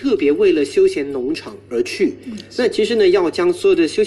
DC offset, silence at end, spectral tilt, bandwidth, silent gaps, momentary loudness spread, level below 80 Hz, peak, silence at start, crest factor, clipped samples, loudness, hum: under 0.1%; 0 s; -5 dB/octave; 12 kHz; none; 10 LU; -50 dBFS; -4 dBFS; 0 s; 12 dB; under 0.1%; -17 LUFS; none